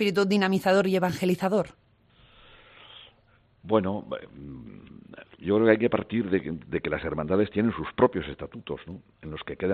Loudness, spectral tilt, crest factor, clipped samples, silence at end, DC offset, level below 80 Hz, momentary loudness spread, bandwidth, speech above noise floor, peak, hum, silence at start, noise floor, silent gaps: -26 LUFS; -6.5 dB/octave; 22 dB; under 0.1%; 0 s; under 0.1%; -56 dBFS; 22 LU; 14 kHz; 36 dB; -4 dBFS; none; 0 s; -62 dBFS; none